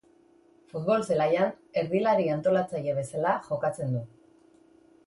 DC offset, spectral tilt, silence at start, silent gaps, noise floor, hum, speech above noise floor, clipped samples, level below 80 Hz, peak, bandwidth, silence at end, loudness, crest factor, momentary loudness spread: under 0.1%; -7 dB/octave; 0.75 s; none; -60 dBFS; none; 33 dB; under 0.1%; -68 dBFS; -12 dBFS; 11.5 kHz; 1 s; -27 LUFS; 18 dB; 8 LU